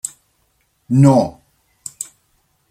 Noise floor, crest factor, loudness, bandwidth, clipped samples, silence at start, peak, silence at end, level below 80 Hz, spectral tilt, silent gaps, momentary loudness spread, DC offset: -63 dBFS; 18 dB; -15 LUFS; 15.5 kHz; under 0.1%; 0.05 s; -2 dBFS; 0.7 s; -54 dBFS; -7.5 dB/octave; none; 22 LU; under 0.1%